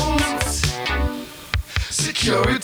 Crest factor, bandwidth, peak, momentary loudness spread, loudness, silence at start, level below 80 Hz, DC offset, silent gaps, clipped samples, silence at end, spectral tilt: 18 dB; over 20 kHz; -4 dBFS; 9 LU; -21 LUFS; 0 s; -28 dBFS; under 0.1%; none; under 0.1%; 0 s; -3.5 dB/octave